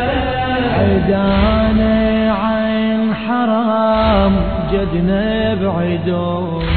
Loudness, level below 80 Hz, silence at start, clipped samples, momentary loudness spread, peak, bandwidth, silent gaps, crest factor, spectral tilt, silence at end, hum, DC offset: -15 LUFS; -26 dBFS; 0 s; under 0.1%; 4 LU; -4 dBFS; 4.5 kHz; none; 12 dB; -10.5 dB/octave; 0 s; none; 0.8%